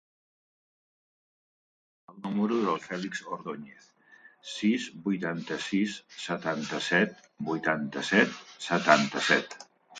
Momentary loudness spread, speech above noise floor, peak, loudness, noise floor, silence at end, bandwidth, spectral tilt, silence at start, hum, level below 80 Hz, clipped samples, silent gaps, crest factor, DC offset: 15 LU; 28 dB; -6 dBFS; -29 LUFS; -57 dBFS; 0 s; 9.4 kHz; -4.5 dB/octave; 2.1 s; none; -74 dBFS; under 0.1%; none; 26 dB; under 0.1%